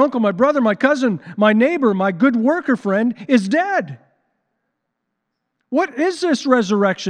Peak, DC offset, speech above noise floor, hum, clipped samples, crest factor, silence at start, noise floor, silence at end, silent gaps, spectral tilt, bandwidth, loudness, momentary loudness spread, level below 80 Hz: 0 dBFS; under 0.1%; 59 dB; none; under 0.1%; 16 dB; 0 s; -76 dBFS; 0 s; none; -6 dB/octave; 10 kHz; -17 LUFS; 6 LU; -72 dBFS